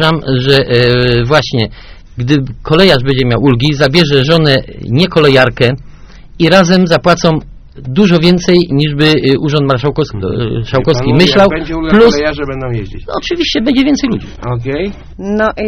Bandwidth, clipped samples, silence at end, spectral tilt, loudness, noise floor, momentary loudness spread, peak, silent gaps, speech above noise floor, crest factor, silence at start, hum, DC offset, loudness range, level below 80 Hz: 13.5 kHz; 1%; 0 s; -6 dB/octave; -10 LUFS; -32 dBFS; 11 LU; 0 dBFS; none; 22 dB; 10 dB; 0 s; none; under 0.1%; 2 LU; -30 dBFS